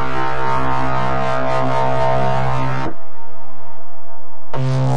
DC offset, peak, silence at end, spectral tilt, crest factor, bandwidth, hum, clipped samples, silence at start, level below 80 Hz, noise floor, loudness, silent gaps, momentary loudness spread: 20%; -4 dBFS; 0 s; -7 dB/octave; 12 dB; 9.8 kHz; none; under 0.1%; 0 s; -40 dBFS; -42 dBFS; -20 LUFS; none; 23 LU